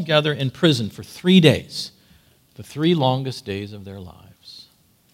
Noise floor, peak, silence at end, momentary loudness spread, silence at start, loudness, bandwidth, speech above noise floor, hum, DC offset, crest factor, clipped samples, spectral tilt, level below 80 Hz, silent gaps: -57 dBFS; 0 dBFS; 0.65 s; 24 LU; 0 s; -20 LUFS; 15.5 kHz; 37 dB; none; under 0.1%; 22 dB; under 0.1%; -6 dB/octave; -58 dBFS; none